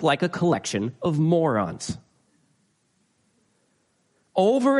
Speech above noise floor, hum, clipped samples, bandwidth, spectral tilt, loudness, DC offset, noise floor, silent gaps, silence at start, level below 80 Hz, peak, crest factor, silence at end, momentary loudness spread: 46 dB; none; under 0.1%; 11.5 kHz; -6 dB/octave; -24 LUFS; under 0.1%; -68 dBFS; none; 0 s; -60 dBFS; -8 dBFS; 18 dB; 0 s; 12 LU